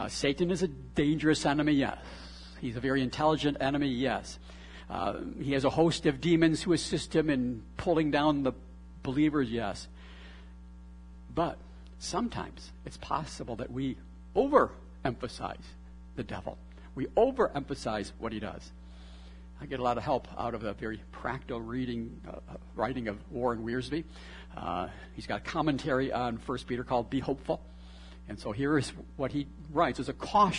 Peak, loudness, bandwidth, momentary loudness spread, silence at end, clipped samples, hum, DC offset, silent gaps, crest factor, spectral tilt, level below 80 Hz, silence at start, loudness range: -8 dBFS; -31 LUFS; 11 kHz; 21 LU; 0 s; under 0.1%; none; under 0.1%; none; 24 dB; -5.5 dB/octave; -50 dBFS; 0 s; 7 LU